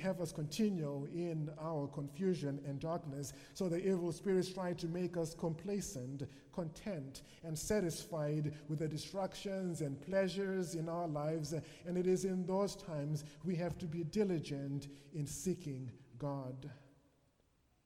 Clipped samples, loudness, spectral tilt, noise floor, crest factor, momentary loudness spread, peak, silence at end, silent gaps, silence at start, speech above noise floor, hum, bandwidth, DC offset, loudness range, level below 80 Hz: under 0.1%; -40 LUFS; -6 dB/octave; -75 dBFS; 16 dB; 9 LU; -24 dBFS; 1 s; none; 0 s; 35 dB; none; 16 kHz; under 0.1%; 3 LU; -66 dBFS